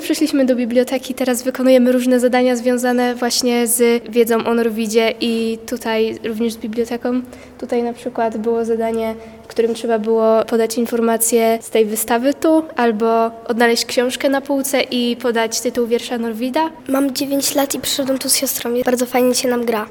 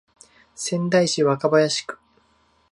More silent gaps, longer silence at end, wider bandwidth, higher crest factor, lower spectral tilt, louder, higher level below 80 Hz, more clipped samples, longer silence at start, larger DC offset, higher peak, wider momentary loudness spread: neither; second, 0 s vs 0.75 s; first, 19 kHz vs 11.5 kHz; about the same, 16 dB vs 18 dB; second, -3 dB/octave vs -4.5 dB/octave; first, -17 LUFS vs -21 LUFS; first, -54 dBFS vs -66 dBFS; neither; second, 0 s vs 0.6 s; neither; first, 0 dBFS vs -4 dBFS; second, 7 LU vs 15 LU